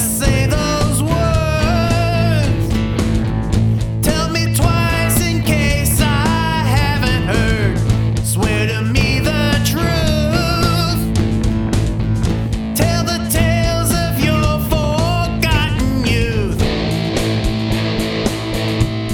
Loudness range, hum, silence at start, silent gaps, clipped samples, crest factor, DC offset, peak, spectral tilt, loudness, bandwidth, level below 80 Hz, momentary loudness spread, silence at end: 2 LU; none; 0 s; none; under 0.1%; 14 dB; under 0.1%; 0 dBFS; -5 dB/octave; -16 LUFS; 19 kHz; -24 dBFS; 3 LU; 0 s